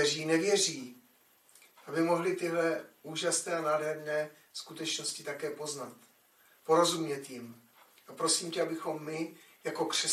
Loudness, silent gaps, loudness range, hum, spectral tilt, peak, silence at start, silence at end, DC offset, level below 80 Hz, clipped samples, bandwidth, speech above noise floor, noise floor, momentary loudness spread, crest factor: -32 LUFS; none; 2 LU; none; -2.5 dB/octave; -14 dBFS; 0 s; 0 s; under 0.1%; -88 dBFS; under 0.1%; 15 kHz; 33 dB; -65 dBFS; 16 LU; 20 dB